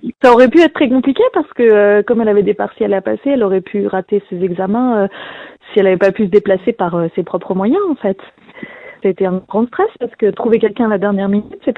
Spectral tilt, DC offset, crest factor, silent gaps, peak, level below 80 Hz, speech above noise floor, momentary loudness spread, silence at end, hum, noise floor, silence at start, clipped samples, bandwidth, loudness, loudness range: -8 dB/octave; under 0.1%; 14 dB; none; 0 dBFS; -52 dBFS; 20 dB; 10 LU; 0.05 s; none; -33 dBFS; 0.05 s; under 0.1%; 7.8 kHz; -14 LUFS; 5 LU